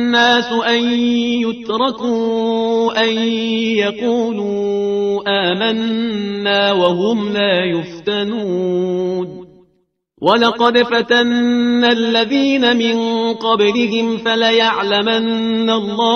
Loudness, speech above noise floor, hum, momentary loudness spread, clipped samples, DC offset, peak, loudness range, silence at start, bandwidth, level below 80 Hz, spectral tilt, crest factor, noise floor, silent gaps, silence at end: -15 LUFS; 47 dB; none; 6 LU; under 0.1%; under 0.1%; 0 dBFS; 3 LU; 0 s; 6.6 kHz; -58 dBFS; -5 dB/octave; 14 dB; -62 dBFS; none; 0 s